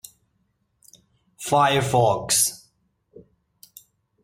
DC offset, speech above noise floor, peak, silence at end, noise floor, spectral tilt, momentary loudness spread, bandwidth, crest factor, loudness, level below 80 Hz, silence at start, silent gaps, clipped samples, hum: under 0.1%; 51 dB; -6 dBFS; 1.05 s; -70 dBFS; -3 dB/octave; 12 LU; 16.5 kHz; 20 dB; -20 LUFS; -58 dBFS; 1.4 s; none; under 0.1%; none